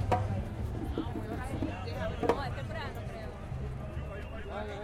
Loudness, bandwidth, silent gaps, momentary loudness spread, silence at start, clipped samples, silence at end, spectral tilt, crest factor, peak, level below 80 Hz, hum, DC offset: -37 LUFS; 15 kHz; none; 9 LU; 0 s; under 0.1%; 0 s; -7 dB/octave; 24 dB; -12 dBFS; -42 dBFS; none; under 0.1%